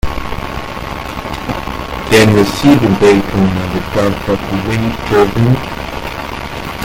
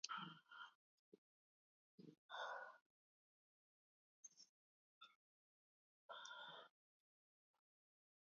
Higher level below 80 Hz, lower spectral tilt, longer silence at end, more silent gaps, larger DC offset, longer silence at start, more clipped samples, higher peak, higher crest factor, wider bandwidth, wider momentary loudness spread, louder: first, -28 dBFS vs under -90 dBFS; first, -6 dB/octave vs -0.5 dB/octave; second, 0 s vs 1.65 s; second, none vs 0.75-1.12 s, 1.18-1.98 s, 2.18-2.29 s, 2.81-4.23 s, 4.49-5.01 s, 5.15-6.09 s; neither; about the same, 0.05 s vs 0.05 s; first, 0.2% vs under 0.1%; first, 0 dBFS vs -28 dBFS; second, 14 dB vs 34 dB; first, 17 kHz vs 6.8 kHz; second, 13 LU vs 16 LU; first, -14 LUFS vs -57 LUFS